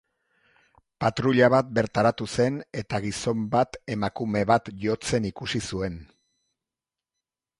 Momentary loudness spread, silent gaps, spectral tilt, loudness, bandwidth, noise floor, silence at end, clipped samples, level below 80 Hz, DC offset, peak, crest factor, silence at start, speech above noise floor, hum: 11 LU; none; -5.5 dB/octave; -25 LUFS; 11.5 kHz; -90 dBFS; 1.55 s; under 0.1%; -52 dBFS; under 0.1%; -6 dBFS; 20 dB; 1 s; 65 dB; none